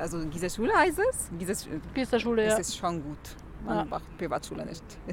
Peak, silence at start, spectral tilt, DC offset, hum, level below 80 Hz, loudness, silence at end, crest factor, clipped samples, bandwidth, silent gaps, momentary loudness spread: -10 dBFS; 0 s; -4 dB/octave; under 0.1%; none; -46 dBFS; -29 LUFS; 0 s; 18 dB; under 0.1%; 17.5 kHz; none; 16 LU